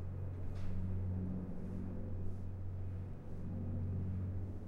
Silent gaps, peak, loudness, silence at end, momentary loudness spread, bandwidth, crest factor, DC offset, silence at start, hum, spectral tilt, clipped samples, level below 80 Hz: none; -28 dBFS; -43 LUFS; 0 s; 5 LU; 3.6 kHz; 12 dB; under 0.1%; 0 s; none; -10.5 dB/octave; under 0.1%; -48 dBFS